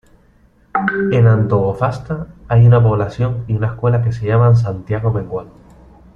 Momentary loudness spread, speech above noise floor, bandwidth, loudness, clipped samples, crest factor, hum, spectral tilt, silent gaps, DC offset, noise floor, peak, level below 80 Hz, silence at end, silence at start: 12 LU; 37 dB; 5.2 kHz; -15 LUFS; under 0.1%; 14 dB; none; -9.5 dB/octave; none; under 0.1%; -51 dBFS; -2 dBFS; -40 dBFS; 0.65 s; 0.75 s